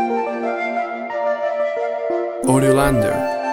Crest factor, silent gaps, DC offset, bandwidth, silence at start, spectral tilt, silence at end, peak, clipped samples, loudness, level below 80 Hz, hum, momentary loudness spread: 16 dB; none; under 0.1%; 17 kHz; 0 s; -6 dB/octave; 0 s; -2 dBFS; under 0.1%; -19 LUFS; -40 dBFS; none; 8 LU